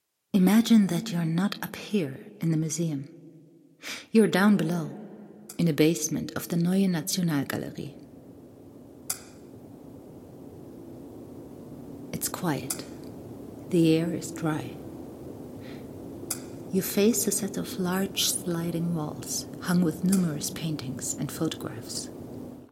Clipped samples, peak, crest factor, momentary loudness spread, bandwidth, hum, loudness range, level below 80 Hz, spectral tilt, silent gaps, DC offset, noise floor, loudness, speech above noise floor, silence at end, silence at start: under 0.1%; -8 dBFS; 22 dB; 22 LU; 16.5 kHz; none; 13 LU; -62 dBFS; -5 dB/octave; none; under 0.1%; -54 dBFS; -27 LUFS; 28 dB; 0.05 s; 0.35 s